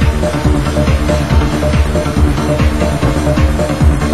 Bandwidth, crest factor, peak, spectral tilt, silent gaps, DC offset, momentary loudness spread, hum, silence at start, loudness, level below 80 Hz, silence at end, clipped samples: 12.5 kHz; 12 dB; 0 dBFS; -6.5 dB/octave; none; 3%; 1 LU; none; 0 s; -13 LUFS; -16 dBFS; 0 s; under 0.1%